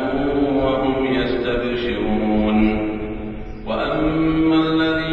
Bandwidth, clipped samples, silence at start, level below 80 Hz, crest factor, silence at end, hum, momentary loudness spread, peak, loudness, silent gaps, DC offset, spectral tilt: 5.6 kHz; under 0.1%; 0 s; -34 dBFS; 14 dB; 0 s; none; 10 LU; -4 dBFS; -19 LUFS; none; under 0.1%; -8.5 dB/octave